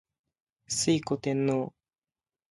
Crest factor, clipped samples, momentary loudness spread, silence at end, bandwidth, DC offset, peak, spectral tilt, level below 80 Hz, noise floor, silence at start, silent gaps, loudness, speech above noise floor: 18 dB; under 0.1%; 6 LU; 0.85 s; 11.5 kHz; under 0.1%; -14 dBFS; -4.5 dB/octave; -66 dBFS; under -90 dBFS; 0.7 s; none; -29 LUFS; over 62 dB